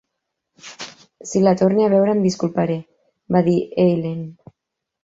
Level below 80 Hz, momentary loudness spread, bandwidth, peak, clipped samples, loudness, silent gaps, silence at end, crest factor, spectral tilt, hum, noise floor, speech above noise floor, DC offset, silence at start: -60 dBFS; 20 LU; 7.8 kHz; -2 dBFS; under 0.1%; -18 LUFS; none; 0.7 s; 18 dB; -7 dB/octave; none; -81 dBFS; 64 dB; under 0.1%; 0.65 s